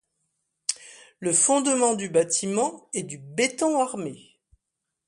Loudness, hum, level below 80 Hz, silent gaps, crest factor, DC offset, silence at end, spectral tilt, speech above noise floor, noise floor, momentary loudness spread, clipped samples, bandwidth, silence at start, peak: -24 LUFS; none; -70 dBFS; none; 22 dB; under 0.1%; 0.9 s; -3 dB/octave; 59 dB; -83 dBFS; 13 LU; under 0.1%; 11.5 kHz; 0.7 s; -4 dBFS